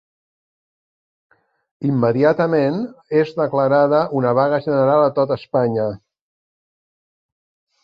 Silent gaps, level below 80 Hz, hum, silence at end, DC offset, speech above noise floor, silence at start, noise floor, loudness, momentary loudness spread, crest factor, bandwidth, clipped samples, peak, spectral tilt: none; -60 dBFS; none; 1.85 s; under 0.1%; over 73 dB; 1.8 s; under -90 dBFS; -18 LUFS; 7 LU; 18 dB; 6.2 kHz; under 0.1%; -2 dBFS; -9.5 dB/octave